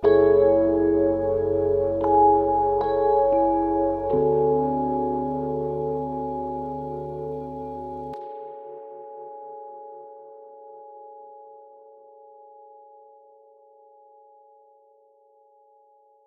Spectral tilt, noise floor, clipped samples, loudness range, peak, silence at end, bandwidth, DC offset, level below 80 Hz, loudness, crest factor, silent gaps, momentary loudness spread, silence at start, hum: -10.5 dB/octave; -58 dBFS; under 0.1%; 22 LU; -8 dBFS; 4.6 s; 4.2 kHz; under 0.1%; -50 dBFS; -23 LUFS; 18 dB; none; 26 LU; 0 s; none